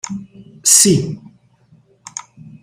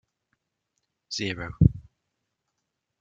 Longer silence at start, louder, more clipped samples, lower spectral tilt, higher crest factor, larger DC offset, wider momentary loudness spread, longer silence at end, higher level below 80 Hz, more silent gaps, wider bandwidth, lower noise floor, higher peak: second, 0.05 s vs 1.1 s; first, -11 LUFS vs -26 LUFS; neither; second, -3 dB/octave vs -6 dB/octave; second, 18 dB vs 26 dB; neither; first, 22 LU vs 13 LU; second, 0.45 s vs 1.2 s; second, -54 dBFS vs -40 dBFS; neither; first, 16.5 kHz vs 7.8 kHz; second, -52 dBFS vs -81 dBFS; first, 0 dBFS vs -4 dBFS